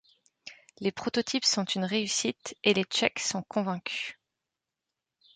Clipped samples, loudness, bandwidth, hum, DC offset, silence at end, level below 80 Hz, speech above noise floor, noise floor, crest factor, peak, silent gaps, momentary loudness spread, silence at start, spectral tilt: under 0.1%; -29 LUFS; 9.6 kHz; none; under 0.1%; 1.25 s; -72 dBFS; 58 dB; -88 dBFS; 24 dB; -8 dBFS; none; 14 LU; 0.45 s; -3 dB/octave